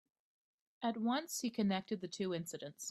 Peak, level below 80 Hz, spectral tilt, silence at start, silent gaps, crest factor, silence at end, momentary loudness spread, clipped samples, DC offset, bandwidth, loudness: -24 dBFS; -80 dBFS; -4.5 dB/octave; 0.8 s; none; 18 dB; 0 s; 7 LU; under 0.1%; under 0.1%; 15.5 kHz; -39 LUFS